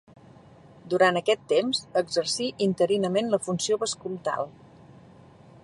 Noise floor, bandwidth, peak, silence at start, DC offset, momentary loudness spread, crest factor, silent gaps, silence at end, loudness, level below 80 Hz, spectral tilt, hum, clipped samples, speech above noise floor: -51 dBFS; 11.5 kHz; -8 dBFS; 0.85 s; under 0.1%; 8 LU; 20 dB; none; 1.15 s; -26 LUFS; -68 dBFS; -4 dB/octave; none; under 0.1%; 26 dB